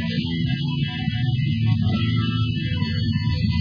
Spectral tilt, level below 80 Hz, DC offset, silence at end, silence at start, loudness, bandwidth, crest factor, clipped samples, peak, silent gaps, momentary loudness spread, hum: -8 dB/octave; -38 dBFS; under 0.1%; 0 s; 0 s; -23 LUFS; 5.2 kHz; 12 dB; under 0.1%; -8 dBFS; none; 3 LU; none